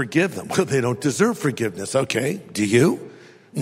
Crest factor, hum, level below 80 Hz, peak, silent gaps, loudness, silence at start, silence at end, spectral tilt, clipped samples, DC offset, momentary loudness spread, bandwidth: 18 dB; none; -62 dBFS; -4 dBFS; none; -21 LUFS; 0 s; 0 s; -5 dB/octave; under 0.1%; under 0.1%; 8 LU; 16 kHz